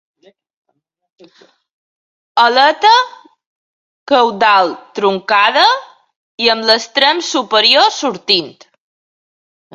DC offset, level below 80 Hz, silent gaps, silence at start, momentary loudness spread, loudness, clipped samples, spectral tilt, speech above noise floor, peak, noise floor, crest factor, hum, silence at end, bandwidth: under 0.1%; -66 dBFS; 3.46-4.06 s, 6.16-6.38 s; 2.35 s; 9 LU; -12 LUFS; under 0.1%; -2 dB/octave; over 78 dB; 0 dBFS; under -90 dBFS; 16 dB; none; 1.25 s; 11.5 kHz